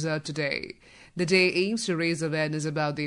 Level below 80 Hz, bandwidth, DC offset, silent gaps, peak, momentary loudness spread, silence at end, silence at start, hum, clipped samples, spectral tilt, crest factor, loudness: -66 dBFS; 11 kHz; under 0.1%; none; -8 dBFS; 15 LU; 0 s; 0 s; none; under 0.1%; -4.5 dB/octave; 18 dB; -26 LUFS